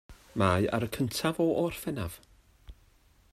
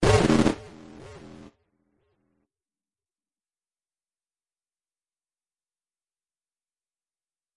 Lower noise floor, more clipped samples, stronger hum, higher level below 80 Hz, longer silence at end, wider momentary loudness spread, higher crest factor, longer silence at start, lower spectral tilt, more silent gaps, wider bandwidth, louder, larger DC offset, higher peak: second, -62 dBFS vs under -90 dBFS; neither; neither; second, -56 dBFS vs -44 dBFS; second, 0.6 s vs 6.3 s; second, 13 LU vs 26 LU; about the same, 20 dB vs 24 dB; about the same, 0.1 s vs 0 s; about the same, -5.5 dB/octave vs -6 dB/octave; neither; first, 16 kHz vs 11.5 kHz; second, -30 LUFS vs -22 LUFS; neither; second, -12 dBFS vs -6 dBFS